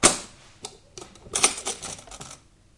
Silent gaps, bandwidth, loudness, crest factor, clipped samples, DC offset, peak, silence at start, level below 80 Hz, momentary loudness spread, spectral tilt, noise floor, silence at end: none; 11.5 kHz; -24 LUFS; 26 dB; under 0.1%; under 0.1%; -4 dBFS; 0 s; -50 dBFS; 23 LU; -1 dB/octave; -49 dBFS; 0.4 s